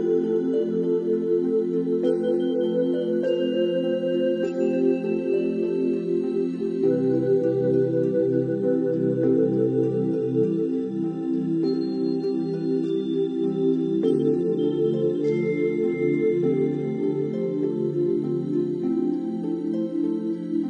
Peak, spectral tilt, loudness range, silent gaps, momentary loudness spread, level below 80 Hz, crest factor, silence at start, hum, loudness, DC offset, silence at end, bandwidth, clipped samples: -10 dBFS; -9.5 dB/octave; 2 LU; none; 4 LU; -68 dBFS; 14 dB; 0 s; none; -24 LUFS; under 0.1%; 0 s; 7 kHz; under 0.1%